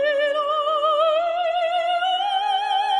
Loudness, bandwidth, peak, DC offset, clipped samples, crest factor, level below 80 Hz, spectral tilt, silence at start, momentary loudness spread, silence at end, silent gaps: -21 LUFS; 11 kHz; -10 dBFS; under 0.1%; under 0.1%; 12 dB; -66 dBFS; -0.5 dB/octave; 0 s; 3 LU; 0 s; none